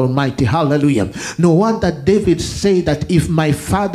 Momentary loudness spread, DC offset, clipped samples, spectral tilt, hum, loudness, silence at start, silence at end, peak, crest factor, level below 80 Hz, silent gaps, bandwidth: 3 LU; under 0.1%; under 0.1%; -6.5 dB/octave; none; -15 LUFS; 0 s; 0 s; 0 dBFS; 14 dB; -36 dBFS; none; 14.5 kHz